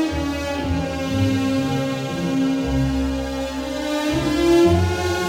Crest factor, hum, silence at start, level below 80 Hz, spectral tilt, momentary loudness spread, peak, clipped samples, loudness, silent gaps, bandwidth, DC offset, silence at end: 14 dB; none; 0 s; -34 dBFS; -6 dB/octave; 8 LU; -6 dBFS; under 0.1%; -21 LUFS; none; 17 kHz; under 0.1%; 0 s